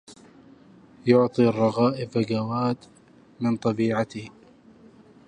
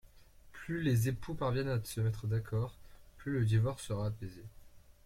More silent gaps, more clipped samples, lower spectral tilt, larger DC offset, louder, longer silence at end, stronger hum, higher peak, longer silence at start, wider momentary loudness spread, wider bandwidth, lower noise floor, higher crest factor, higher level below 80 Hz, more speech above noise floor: neither; neither; about the same, -7.5 dB/octave vs -7 dB/octave; neither; first, -24 LUFS vs -35 LUFS; first, 1 s vs 0.15 s; neither; first, -6 dBFS vs -20 dBFS; second, 0.1 s vs 0.45 s; second, 11 LU vs 15 LU; second, 9.6 kHz vs 15.5 kHz; second, -52 dBFS vs -58 dBFS; about the same, 20 dB vs 16 dB; second, -64 dBFS vs -54 dBFS; first, 29 dB vs 24 dB